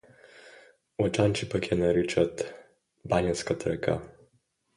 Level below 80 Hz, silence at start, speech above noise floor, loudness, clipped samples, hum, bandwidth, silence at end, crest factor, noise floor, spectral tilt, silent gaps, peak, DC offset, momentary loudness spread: -52 dBFS; 0.45 s; 44 dB; -28 LUFS; under 0.1%; none; 11.5 kHz; 0.65 s; 20 dB; -71 dBFS; -5.5 dB/octave; none; -10 dBFS; under 0.1%; 12 LU